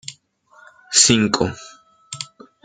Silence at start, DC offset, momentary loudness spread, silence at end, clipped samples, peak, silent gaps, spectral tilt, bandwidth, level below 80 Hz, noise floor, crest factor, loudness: 0.1 s; under 0.1%; 24 LU; 0.4 s; under 0.1%; 0 dBFS; none; -2.5 dB/octave; 10 kHz; -52 dBFS; -53 dBFS; 22 dB; -15 LUFS